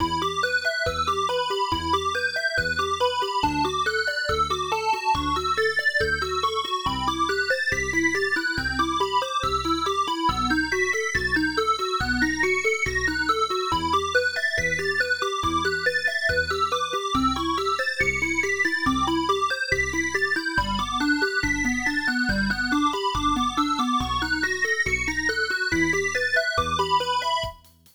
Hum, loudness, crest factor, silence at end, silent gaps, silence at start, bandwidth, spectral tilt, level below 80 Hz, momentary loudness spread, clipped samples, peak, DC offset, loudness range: none; -23 LUFS; 16 dB; 0.4 s; none; 0 s; over 20 kHz; -3.5 dB/octave; -42 dBFS; 3 LU; under 0.1%; -8 dBFS; under 0.1%; 1 LU